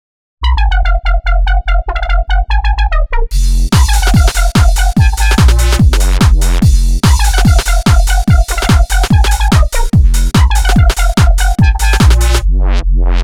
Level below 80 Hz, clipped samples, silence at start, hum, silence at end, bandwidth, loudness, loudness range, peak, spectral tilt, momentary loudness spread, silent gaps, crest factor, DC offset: -10 dBFS; under 0.1%; 0.4 s; none; 0 s; 15.5 kHz; -11 LUFS; 3 LU; 0 dBFS; -5 dB/octave; 5 LU; none; 8 dB; under 0.1%